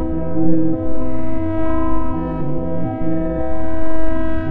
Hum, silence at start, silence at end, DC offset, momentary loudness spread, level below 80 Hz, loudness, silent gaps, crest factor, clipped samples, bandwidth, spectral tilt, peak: none; 0 s; 0 s; under 0.1%; 5 LU; -28 dBFS; -22 LUFS; none; 12 dB; under 0.1%; 4.1 kHz; -11.5 dB/octave; 0 dBFS